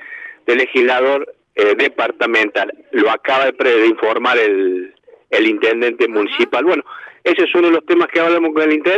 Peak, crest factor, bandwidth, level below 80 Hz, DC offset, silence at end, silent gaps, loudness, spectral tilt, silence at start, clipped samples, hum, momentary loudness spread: 0 dBFS; 14 dB; 8 kHz; -76 dBFS; under 0.1%; 0 s; none; -15 LUFS; -4.5 dB/octave; 0 s; under 0.1%; none; 8 LU